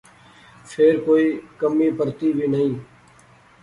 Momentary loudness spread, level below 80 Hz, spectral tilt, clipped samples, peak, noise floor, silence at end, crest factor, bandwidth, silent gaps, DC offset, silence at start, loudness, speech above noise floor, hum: 7 LU; -62 dBFS; -7.5 dB/octave; under 0.1%; -6 dBFS; -51 dBFS; 0.8 s; 16 dB; 11 kHz; none; under 0.1%; 0.65 s; -20 LUFS; 32 dB; none